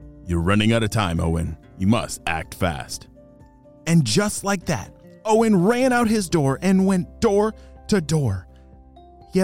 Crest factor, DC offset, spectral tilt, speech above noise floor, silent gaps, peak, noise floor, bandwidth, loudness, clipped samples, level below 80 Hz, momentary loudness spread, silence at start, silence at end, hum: 14 dB; 0.4%; -5.5 dB/octave; 28 dB; none; -6 dBFS; -48 dBFS; 16.5 kHz; -21 LUFS; under 0.1%; -40 dBFS; 13 LU; 0 s; 0 s; none